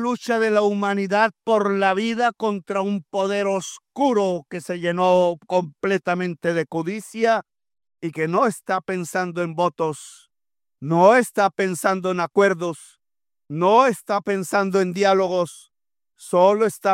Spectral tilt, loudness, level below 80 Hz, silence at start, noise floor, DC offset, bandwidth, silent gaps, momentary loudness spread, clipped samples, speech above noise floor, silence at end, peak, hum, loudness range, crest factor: -5.5 dB/octave; -21 LUFS; -72 dBFS; 0 s; under -90 dBFS; under 0.1%; 16 kHz; none; 10 LU; under 0.1%; over 70 dB; 0 s; -2 dBFS; none; 4 LU; 20 dB